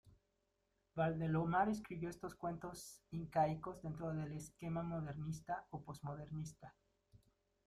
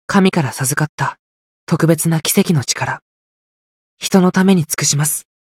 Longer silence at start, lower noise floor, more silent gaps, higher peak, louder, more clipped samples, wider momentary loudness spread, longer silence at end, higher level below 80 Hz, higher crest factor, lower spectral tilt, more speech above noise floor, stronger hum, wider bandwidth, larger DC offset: about the same, 0.05 s vs 0.1 s; second, -84 dBFS vs under -90 dBFS; second, none vs 0.89-0.98 s, 1.19-1.67 s, 3.02-3.97 s; second, -24 dBFS vs 0 dBFS; second, -43 LUFS vs -15 LUFS; neither; first, 13 LU vs 9 LU; first, 0.5 s vs 0.2 s; second, -68 dBFS vs -56 dBFS; about the same, 20 dB vs 16 dB; first, -7 dB/octave vs -4.5 dB/octave; second, 42 dB vs over 75 dB; neither; second, 14 kHz vs 16 kHz; neither